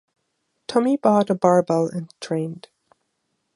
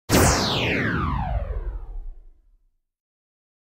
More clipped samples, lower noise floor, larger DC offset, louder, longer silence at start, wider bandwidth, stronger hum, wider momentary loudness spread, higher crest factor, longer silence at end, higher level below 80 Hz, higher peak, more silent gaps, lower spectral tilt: neither; first, -74 dBFS vs -63 dBFS; neither; about the same, -20 LUFS vs -22 LUFS; first, 0.7 s vs 0.1 s; second, 11.5 kHz vs 16 kHz; neither; second, 14 LU vs 21 LU; about the same, 20 dB vs 22 dB; second, 0.95 s vs 1.35 s; second, -70 dBFS vs -32 dBFS; about the same, -2 dBFS vs -2 dBFS; neither; first, -7 dB/octave vs -4 dB/octave